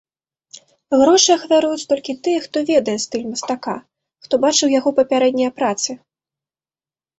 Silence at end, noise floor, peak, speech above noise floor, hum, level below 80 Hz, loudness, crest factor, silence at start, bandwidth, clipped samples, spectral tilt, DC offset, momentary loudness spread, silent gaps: 1.2 s; under -90 dBFS; -2 dBFS; over 73 dB; none; -62 dBFS; -17 LUFS; 16 dB; 0.55 s; 8.2 kHz; under 0.1%; -2.5 dB/octave; under 0.1%; 11 LU; none